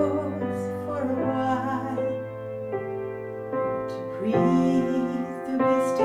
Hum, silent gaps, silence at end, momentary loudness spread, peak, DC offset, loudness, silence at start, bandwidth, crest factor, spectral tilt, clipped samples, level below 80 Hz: none; none; 0 s; 10 LU; -10 dBFS; under 0.1%; -27 LUFS; 0 s; 12.5 kHz; 16 dB; -7.5 dB/octave; under 0.1%; -60 dBFS